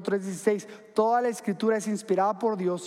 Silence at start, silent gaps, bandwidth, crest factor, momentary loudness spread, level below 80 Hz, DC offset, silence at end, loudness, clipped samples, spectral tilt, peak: 0 s; none; 14.5 kHz; 16 dB; 5 LU; -86 dBFS; under 0.1%; 0 s; -27 LUFS; under 0.1%; -5.5 dB/octave; -10 dBFS